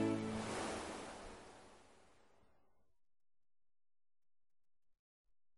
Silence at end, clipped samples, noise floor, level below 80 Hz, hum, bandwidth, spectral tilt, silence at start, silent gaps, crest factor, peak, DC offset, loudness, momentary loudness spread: 3.65 s; under 0.1%; -80 dBFS; -68 dBFS; none; 11.5 kHz; -5 dB/octave; 0 s; none; 22 dB; -26 dBFS; under 0.1%; -45 LUFS; 21 LU